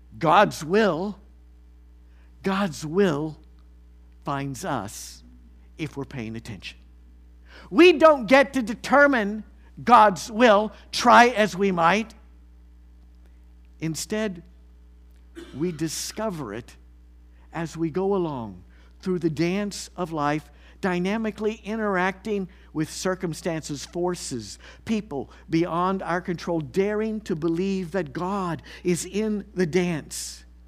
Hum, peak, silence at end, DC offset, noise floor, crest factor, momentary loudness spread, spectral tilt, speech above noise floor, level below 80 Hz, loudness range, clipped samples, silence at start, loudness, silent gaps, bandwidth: none; 0 dBFS; 0.3 s; under 0.1%; -50 dBFS; 24 dB; 17 LU; -5 dB/octave; 27 dB; -50 dBFS; 14 LU; under 0.1%; 0.1 s; -23 LUFS; none; 15.5 kHz